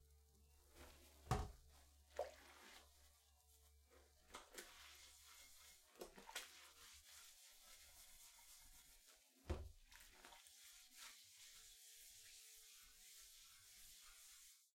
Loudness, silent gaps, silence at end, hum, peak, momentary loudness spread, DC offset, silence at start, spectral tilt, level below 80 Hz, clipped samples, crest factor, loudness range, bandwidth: -58 LUFS; none; 0.05 s; none; -28 dBFS; 12 LU; under 0.1%; 0 s; -3.5 dB/octave; -66 dBFS; under 0.1%; 32 dB; 7 LU; 16.5 kHz